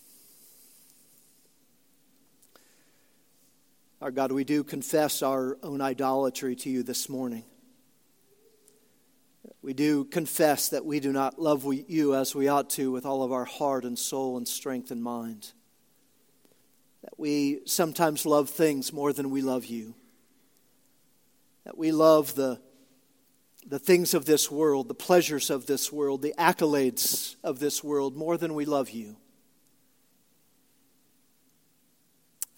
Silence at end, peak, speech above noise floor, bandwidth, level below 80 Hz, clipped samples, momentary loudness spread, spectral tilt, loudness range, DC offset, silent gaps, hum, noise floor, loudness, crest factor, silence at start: 0.15 s; -4 dBFS; 41 dB; 17 kHz; -80 dBFS; under 0.1%; 12 LU; -4 dB/octave; 9 LU; under 0.1%; none; none; -68 dBFS; -27 LUFS; 26 dB; 4 s